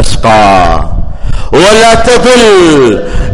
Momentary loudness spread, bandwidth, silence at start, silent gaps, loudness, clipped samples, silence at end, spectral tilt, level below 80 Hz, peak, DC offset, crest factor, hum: 15 LU; 11.5 kHz; 0 s; none; -5 LUFS; 2%; 0 s; -4.5 dB/octave; -14 dBFS; 0 dBFS; under 0.1%; 4 dB; none